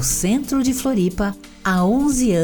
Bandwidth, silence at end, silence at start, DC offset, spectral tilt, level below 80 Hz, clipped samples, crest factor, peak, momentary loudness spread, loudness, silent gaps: 19.5 kHz; 0 s; 0 s; under 0.1%; -5 dB/octave; -36 dBFS; under 0.1%; 12 dB; -6 dBFS; 7 LU; -19 LUFS; none